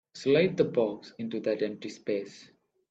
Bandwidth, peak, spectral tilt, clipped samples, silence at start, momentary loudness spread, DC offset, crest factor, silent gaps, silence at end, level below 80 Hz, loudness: 8 kHz; -12 dBFS; -6.5 dB/octave; under 0.1%; 0.15 s; 13 LU; under 0.1%; 18 dB; none; 0.45 s; -70 dBFS; -29 LUFS